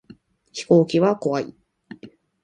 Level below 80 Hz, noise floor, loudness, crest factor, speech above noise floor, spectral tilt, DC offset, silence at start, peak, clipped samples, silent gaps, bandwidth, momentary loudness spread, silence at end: -66 dBFS; -50 dBFS; -20 LUFS; 20 dB; 31 dB; -7 dB/octave; under 0.1%; 0.55 s; -2 dBFS; under 0.1%; none; 10 kHz; 19 LU; 0.35 s